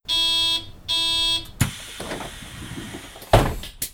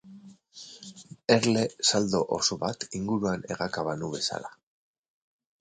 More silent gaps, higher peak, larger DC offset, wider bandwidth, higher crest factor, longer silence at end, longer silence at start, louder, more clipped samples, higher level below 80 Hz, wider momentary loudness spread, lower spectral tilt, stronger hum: neither; first, -2 dBFS vs -6 dBFS; neither; first, 19.5 kHz vs 9.6 kHz; about the same, 22 dB vs 24 dB; second, 0 s vs 1.1 s; about the same, 0.05 s vs 0.05 s; first, -21 LUFS vs -27 LUFS; neither; first, -36 dBFS vs -62 dBFS; second, 17 LU vs 21 LU; about the same, -3.5 dB/octave vs -3.5 dB/octave; neither